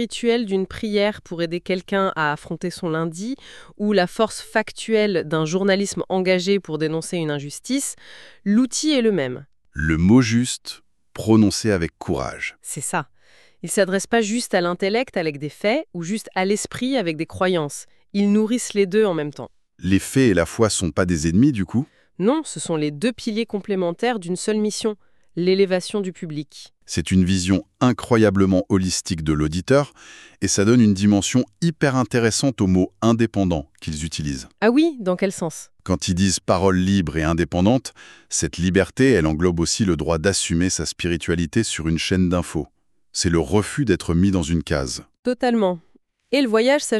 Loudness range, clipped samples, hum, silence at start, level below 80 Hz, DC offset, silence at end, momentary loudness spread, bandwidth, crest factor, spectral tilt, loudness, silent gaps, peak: 4 LU; under 0.1%; none; 0 s; -42 dBFS; under 0.1%; 0 s; 11 LU; 13 kHz; 18 dB; -5 dB/octave; -21 LUFS; 45.19-45.23 s; -2 dBFS